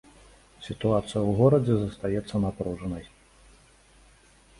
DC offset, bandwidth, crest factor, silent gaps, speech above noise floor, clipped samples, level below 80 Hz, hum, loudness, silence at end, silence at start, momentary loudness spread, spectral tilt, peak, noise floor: under 0.1%; 11.5 kHz; 20 dB; none; 32 dB; under 0.1%; -50 dBFS; none; -26 LUFS; 1.55 s; 0.6 s; 16 LU; -8 dB/octave; -8 dBFS; -57 dBFS